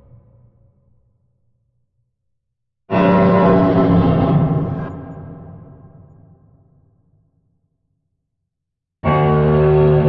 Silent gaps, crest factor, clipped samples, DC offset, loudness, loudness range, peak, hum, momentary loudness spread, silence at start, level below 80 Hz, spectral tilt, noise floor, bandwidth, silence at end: none; 16 dB; under 0.1%; under 0.1%; -14 LUFS; 12 LU; -2 dBFS; none; 20 LU; 2.9 s; -38 dBFS; -11 dB/octave; -79 dBFS; 5.2 kHz; 0 s